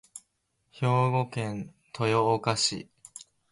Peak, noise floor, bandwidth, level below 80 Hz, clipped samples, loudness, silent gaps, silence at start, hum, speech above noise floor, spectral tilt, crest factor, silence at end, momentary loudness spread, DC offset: -10 dBFS; -75 dBFS; 11.5 kHz; -64 dBFS; under 0.1%; -27 LUFS; none; 0.15 s; none; 49 dB; -4.5 dB/octave; 18 dB; 0.35 s; 22 LU; under 0.1%